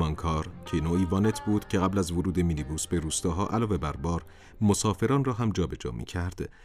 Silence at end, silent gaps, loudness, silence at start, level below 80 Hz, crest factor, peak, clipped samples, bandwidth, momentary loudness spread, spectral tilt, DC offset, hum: 0 s; none; -28 LUFS; 0 s; -44 dBFS; 16 dB; -10 dBFS; under 0.1%; 15.5 kHz; 8 LU; -6 dB/octave; under 0.1%; none